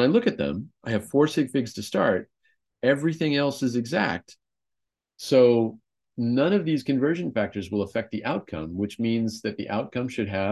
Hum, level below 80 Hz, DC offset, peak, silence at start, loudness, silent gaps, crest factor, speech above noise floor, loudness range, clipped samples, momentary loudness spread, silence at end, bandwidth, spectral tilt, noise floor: none; -56 dBFS; under 0.1%; -8 dBFS; 0 s; -25 LUFS; none; 18 dB; 64 dB; 3 LU; under 0.1%; 9 LU; 0 s; 12.5 kHz; -6.5 dB/octave; -88 dBFS